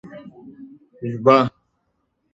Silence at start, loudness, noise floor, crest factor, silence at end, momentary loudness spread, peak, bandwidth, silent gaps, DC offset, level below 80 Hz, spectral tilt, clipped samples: 0.05 s; -18 LUFS; -71 dBFS; 22 dB; 0.85 s; 25 LU; -2 dBFS; 7.8 kHz; none; under 0.1%; -62 dBFS; -7.5 dB/octave; under 0.1%